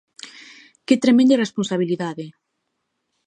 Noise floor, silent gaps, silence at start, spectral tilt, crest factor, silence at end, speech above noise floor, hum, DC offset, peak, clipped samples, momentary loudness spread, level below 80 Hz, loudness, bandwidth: -75 dBFS; none; 0.25 s; -5.5 dB/octave; 18 dB; 0.95 s; 58 dB; none; under 0.1%; -2 dBFS; under 0.1%; 24 LU; -72 dBFS; -19 LUFS; 9.8 kHz